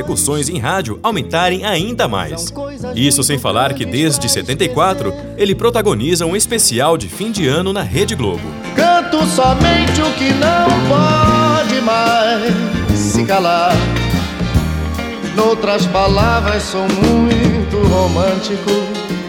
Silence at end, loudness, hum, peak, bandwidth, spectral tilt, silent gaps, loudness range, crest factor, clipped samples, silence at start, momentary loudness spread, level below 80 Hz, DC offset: 0 s; -14 LUFS; none; 0 dBFS; 18 kHz; -4.5 dB/octave; none; 3 LU; 14 dB; under 0.1%; 0 s; 7 LU; -28 dBFS; under 0.1%